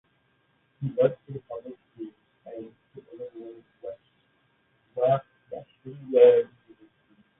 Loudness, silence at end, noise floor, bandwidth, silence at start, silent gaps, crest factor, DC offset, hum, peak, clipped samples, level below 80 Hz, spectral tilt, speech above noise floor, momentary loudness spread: -23 LUFS; 0.95 s; -69 dBFS; 3.8 kHz; 0.8 s; none; 22 dB; under 0.1%; none; -6 dBFS; under 0.1%; -72 dBFS; -11 dB/octave; 46 dB; 27 LU